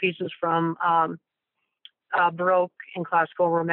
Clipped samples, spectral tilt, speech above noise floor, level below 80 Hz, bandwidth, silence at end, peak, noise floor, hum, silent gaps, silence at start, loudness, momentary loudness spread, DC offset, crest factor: under 0.1%; -4 dB/octave; 56 dB; -80 dBFS; 4.2 kHz; 0 s; -8 dBFS; -80 dBFS; none; none; 0 s; -24 LUFS; 7 LU; under 0.1%; 16 dB